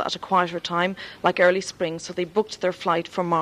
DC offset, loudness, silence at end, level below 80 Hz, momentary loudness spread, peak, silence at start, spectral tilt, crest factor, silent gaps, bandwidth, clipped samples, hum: under 0.1%; -24 LUFS; 0 s; -62 dBFS; 8 LU; -4 dBFS; 0 s; -4.5 dB/octave; 20 dB; none; 12 kHz; under 0.1%; none